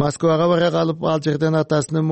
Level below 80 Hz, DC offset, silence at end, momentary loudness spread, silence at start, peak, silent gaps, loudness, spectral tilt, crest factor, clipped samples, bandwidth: -54 dBFS; under 0.1%; 0 s; 4 LU; 0 s; -6 dBFS; none; -19 LUFS; -6.5 dB/octave; 12 dB; under 0.1%; 8.8 kHz